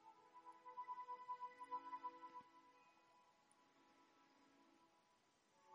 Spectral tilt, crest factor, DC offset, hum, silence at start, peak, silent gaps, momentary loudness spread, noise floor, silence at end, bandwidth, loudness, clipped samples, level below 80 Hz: -3 dB/octave; 20 dB; under 0.1%; none; 0 s; -40 dBFS; none; 12 LU; -79 dBFS; 0 s; 9.6 kHz; -55 LUFS; under 0.1%; under -90 dBFS